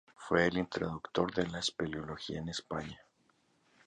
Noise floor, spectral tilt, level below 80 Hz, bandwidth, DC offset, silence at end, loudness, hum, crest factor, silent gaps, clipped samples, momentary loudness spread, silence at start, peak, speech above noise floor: -72 dBFS; -5 dB/octave; -60 dBFS; 10 kHz; under 0.1%; 0.9 s; -35 LUFS; none; 24 dB; none; under 0.1%; 11 LU; 0.2 s; -12 dBFS; 37 dB